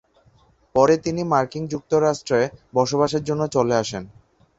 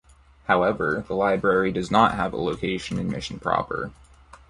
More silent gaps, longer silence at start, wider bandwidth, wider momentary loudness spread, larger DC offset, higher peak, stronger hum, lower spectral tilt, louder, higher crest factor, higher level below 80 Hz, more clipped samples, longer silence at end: neither; first, 0.75 s vs 0.5 s; second, 8 kHz vs 11.5 kHz; about the same, 8 LU vs 10 LU; neither; about the same, -2 dBFS vs -2 dBFS; neither; about the same, -5.5 dB/octave vs -6 dB/octave; first, -21 LUFS vs -24 LUFS; about the same, 20 dB vs 22 dB; second, -54 dBFS vs -48 dBFS; neither; first, 0.5 s vs 0.15 s